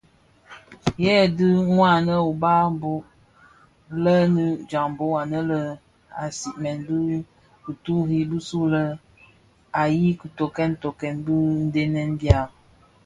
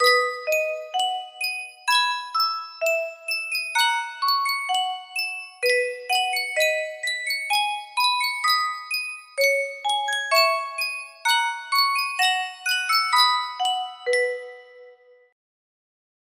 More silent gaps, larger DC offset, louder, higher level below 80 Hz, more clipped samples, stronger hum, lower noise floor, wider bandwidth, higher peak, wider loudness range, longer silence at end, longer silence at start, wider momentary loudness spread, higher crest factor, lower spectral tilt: neither; neither; about the same, -22 LUFS vs -22 LUFS; first, -42 dBFS vs -80 dBFS; neither; neither; first, -57 dBFS vs -51 dBFS; second, 10.5 kHz vs 16 kHz; first, 0 dBFS vs -4 dBFS; first, 6 LU vs 3 LU; second, 0.55 s vs 1.35 s; first, 0.5 s vs 0 s; first, 13 LU vs 8 LU; about the same, 22 dB vs 20 dB; first, -7 dB/octave vs 3.5 dB/octave